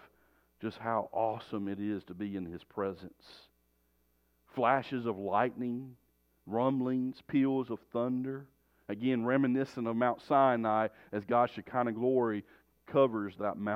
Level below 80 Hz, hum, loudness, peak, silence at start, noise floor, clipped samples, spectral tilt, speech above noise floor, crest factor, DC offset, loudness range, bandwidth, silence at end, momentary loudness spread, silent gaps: -74 dBFS; none; -33 LUFS; -12 dBFS; 0.6 s; -73 dBFS; under 0.1%; -8.5 dB/octave; 41 dB; 20 dB; under 0.1%; 7 LU; 6.4 kHz; 0 s; 12 LU; none